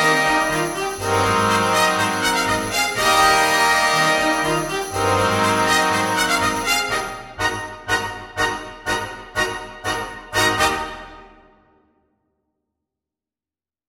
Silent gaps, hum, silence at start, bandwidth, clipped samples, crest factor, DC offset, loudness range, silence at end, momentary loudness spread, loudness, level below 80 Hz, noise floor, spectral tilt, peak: none; none; 0 s; 17 kHz; under 0.1%; 18 dB; under 0.1%; 8 LU; 2.65 s; 10 LU; -19 LUFS; -44 dBFS; under -90 dBFS; -2.5 dB/octave; -2 dBFS